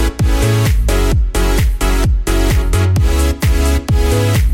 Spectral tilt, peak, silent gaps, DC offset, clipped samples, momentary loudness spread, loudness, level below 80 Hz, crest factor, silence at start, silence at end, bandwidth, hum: -5.5 dB/octave; -2 dBFS; none; under 0.1%; under 0.1%; 2 LU; -14 LUFS; -14 dBFS; 10 dB; 0 s; 0 s; 16.5 kHz; none